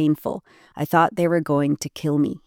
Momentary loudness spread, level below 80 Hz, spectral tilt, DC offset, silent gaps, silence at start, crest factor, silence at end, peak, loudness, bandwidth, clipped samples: 12 LU; -60 dBFS; -6.5 dB/octave; under 0.1%; none; 0 s; 16 dB; 0.1 s; -6 dBFS; -22 LUFS; 17.5 kHz; under 0.1%